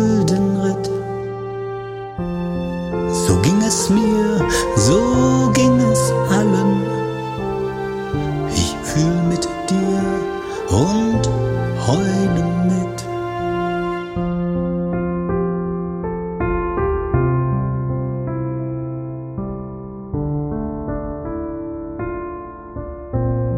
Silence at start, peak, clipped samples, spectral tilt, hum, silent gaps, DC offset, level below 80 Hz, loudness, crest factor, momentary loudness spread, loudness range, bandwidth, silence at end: 0 s; -2 dBFS; under 0.1%; -6 dB/octave; none; none; under 0.1%; -34 dBFS; -19 LUFS; 18 dB; 12 LU; 10 LU; 16 kHz; 0 s